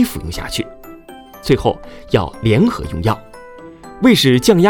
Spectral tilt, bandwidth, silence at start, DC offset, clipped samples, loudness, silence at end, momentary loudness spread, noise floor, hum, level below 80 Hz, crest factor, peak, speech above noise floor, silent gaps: -5.5 dB/octave; 19.5 kHz; 0 s; under 0.1%; under 0.1%; -16 LUFS; 0 s; 25 LU; -37 dBFS; none; -36 dBFS; 16 dB; 0 dBFS; 23 dB; none